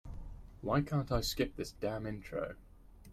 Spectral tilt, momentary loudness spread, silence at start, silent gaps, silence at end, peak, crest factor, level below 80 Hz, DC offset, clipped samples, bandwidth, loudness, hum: -5.5 dB/octave; 18 LU; 0.05 s; none; 0 s; -18 dBFS; 20 dB; -50 dBFS; under 0.1%; under 0.1%; 16 kHz; -37 LUFS; none